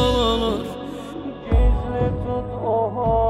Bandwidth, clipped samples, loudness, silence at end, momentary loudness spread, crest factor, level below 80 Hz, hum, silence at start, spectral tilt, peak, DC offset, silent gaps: 12 kHz; under 0.1%; -23 LUFS; 0 s; 12 LU; 14 dB; -26 dBFS; none; 0 s; -7 dB/octave; -8 dBFS; under 0.1%; none